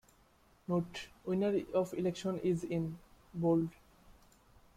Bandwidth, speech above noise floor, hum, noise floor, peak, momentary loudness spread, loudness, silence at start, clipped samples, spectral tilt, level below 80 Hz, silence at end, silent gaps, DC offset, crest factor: 15 kHz; 32 dB; none; -67 dBFS; -20 dBFS; 12 LU; -36 LUFS; 0.7 s; under 0.1%; -7.5 dB/octave; -66 dBFS; 0.65 s; none; under 0.1%; 16 dB